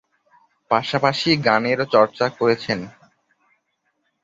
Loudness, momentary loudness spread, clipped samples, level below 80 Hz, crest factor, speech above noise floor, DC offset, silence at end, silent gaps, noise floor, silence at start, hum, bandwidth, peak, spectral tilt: -19 LUFS; 8 LU; under 0.1%; -60 dBFS; 20 dB; 52 dB; under 0.1%; 1.35 s; none; -71 dBFS; 0.7 s; none; 7.8 kHz; -2 dBFS; -5.5 dB/octave